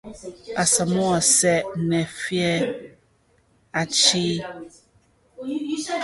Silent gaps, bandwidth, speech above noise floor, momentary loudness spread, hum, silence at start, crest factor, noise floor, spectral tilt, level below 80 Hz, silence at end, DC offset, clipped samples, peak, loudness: none; 12 kHz; 39 dB; 20 LU; none; 0.05 s; 20 dB; -62 dBFS; -3 dB/octave; -56 dBFS; 0 s; under 0.1%; under 0.1%; -4 dBFS; -21 LUFS